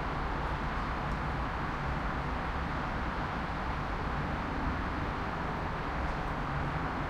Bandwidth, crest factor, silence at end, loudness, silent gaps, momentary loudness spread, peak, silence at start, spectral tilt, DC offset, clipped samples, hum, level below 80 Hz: 10.5 kHz; 14 dB; 0 s; -35 LUFS; none; 1 LU; -20 dBFS; 0 s; -7 dB/octave; under 0.1%; under 0.1%; none; -40 dBFS